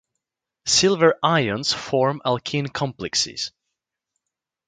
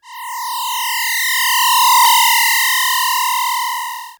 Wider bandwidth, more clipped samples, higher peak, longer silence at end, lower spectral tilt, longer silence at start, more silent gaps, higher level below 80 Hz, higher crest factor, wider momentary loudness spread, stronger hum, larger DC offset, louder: second, 9.6 kHz vs over 20 kHz; neither; about the same, -2 dBFS vs 0 dBFS; first, 1.2 s vs 0.05 s; first, -3.5 dB/octave vs 6.5 dB/octave; first, 0.65 s vs 0.05 s; neither; about the same, -58 dBFS vs -60 dBFS; about the same, 20 dB vs 16 dB; about the same, 10 LU vs 12 LU; neither; neither; second, -21 LUFS vs -13 LUFS